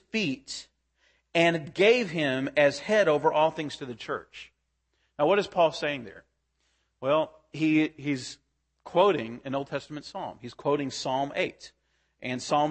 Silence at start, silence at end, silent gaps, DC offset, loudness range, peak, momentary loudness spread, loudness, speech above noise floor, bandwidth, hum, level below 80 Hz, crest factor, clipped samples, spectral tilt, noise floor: 0.15 s; 0 s; none; under 0.1%; 5 LU; -8 dBFS; 14 LU; -27 LUFS; 49 dB; 8.8 kHz; none; -68 dBFS; 20 dB; under 0.1%; -5 dB/octave; -76 dBFS